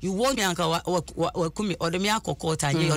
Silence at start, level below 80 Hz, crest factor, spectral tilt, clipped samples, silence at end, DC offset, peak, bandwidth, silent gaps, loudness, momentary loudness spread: 0 s; -48 dBFS; 12 dB; -4.5 dB/octave; under 0.1%; 0 s; under 0.1%; -12 dBFS; 16 kHz; none; -26 LUFS; 5 LU